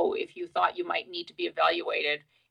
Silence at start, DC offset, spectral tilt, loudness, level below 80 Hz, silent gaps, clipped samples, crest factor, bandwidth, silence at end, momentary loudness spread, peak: 0 s; under 0.1%; -4 dB/octave; -29 LUFS; -76 dBFS; none; under 0.1%; 20 dB; 10 kHz; 0.3 s; 8 LU; -10 dBFS